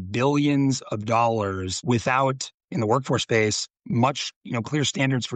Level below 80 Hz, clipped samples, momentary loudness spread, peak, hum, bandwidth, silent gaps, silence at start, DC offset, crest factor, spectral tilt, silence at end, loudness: -60 dBFS; under 0.1%; 7 LU; -8 dBFS; none; 9.2 kHz; 2.54-2.68 s, 4.36-4.41 s; 0 s; under 0.1%; 16 dB; -5 dB/octave; 0 s; -24 LUFS